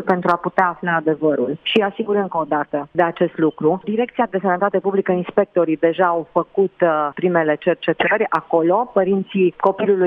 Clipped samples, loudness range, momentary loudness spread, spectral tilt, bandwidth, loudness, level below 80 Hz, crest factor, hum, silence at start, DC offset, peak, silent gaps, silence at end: under 0.1%; 2 LU; 4 LU; -8.5 dB/octave; 5.6 kHz; -19 LUFS; -62 dBFS; 16 dB; none; 0 s; under 0.1%; -2 dBFS; none; 0 s